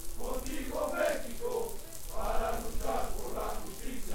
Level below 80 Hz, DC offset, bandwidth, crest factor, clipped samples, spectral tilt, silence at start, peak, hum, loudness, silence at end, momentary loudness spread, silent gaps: -40 dBFS; under 0.1%; 17 kHz; 14 dB; under 0.1%; -4 dB/octave; 0 s; -18 dBFS; none; -36 LUFS; 0 s; 9 LU; none